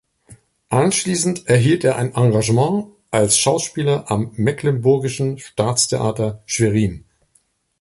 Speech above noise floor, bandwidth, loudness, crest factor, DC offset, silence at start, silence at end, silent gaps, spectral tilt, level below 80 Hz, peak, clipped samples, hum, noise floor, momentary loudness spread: 44 dB; 11.5 kHz; -18 LUFS; 18 dB; under 0.1%; 0.3 s; 0.8 s; none; -5 dB/octave; -48 dBFS; -2 dBFS; under 0.1%; none; -62 dBFS; 8 LU